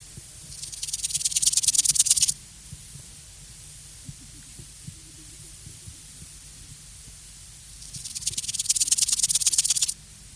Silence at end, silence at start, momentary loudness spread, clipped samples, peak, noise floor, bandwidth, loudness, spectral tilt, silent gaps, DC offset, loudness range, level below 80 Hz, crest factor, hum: 0 s; 0 s; 24 LU; under 0.1%; -4 dBFS; -45 dBFS; 11 kHz; -21 LUFS; 1 dB/octave; none; under 0.1%; 20 LU; -52 dBFS; 26 dB; none